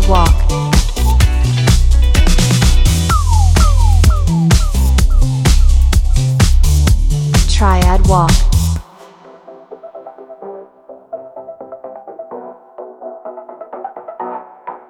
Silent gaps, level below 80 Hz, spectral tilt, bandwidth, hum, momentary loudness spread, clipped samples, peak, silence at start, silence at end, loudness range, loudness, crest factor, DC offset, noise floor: none; -14 dBFS; -5 dB/octave; 16.5 kHz; none; 20 LU; under 0.1%; 0 dBFS; 0 s; 0.1 s; 19 LU; -13 LUFS; 12 dB; under 0.1%; -39 dBFS